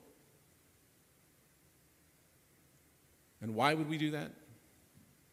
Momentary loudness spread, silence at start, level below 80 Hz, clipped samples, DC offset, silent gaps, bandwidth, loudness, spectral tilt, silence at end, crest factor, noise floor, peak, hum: 16 LU; 3.4 s; -80 dBFS; under 0.1%; under 0.1%; none; 15.5 kHz; -36 LUFS; -5.5 dB/octave; 0.8 s; 30 dB; -68 dBFS; -12 dBFS; none